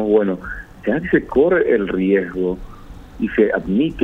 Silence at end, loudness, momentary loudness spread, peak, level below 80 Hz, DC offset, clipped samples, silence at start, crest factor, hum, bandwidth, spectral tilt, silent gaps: 0 s; -18 LUFS; 11 LU; -2 dBFS; -40 dBFS; under 0.1%; under 0.1%; 0 s; 16 dB; none; 4.2 kHz; -8.5 dB/octave; none